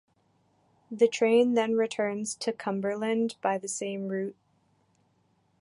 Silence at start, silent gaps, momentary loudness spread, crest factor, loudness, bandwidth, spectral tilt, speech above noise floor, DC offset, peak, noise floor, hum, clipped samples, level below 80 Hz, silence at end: 0.9 s; none; 10 LU; 20 dB; -28 LUFS; 11.5 kHz; -4.5 dB/octave; 42 dB; under 0.1%; -10 dBFS; -69 dBFS; none; under 0.1%; -80 dBFS; 1.3 s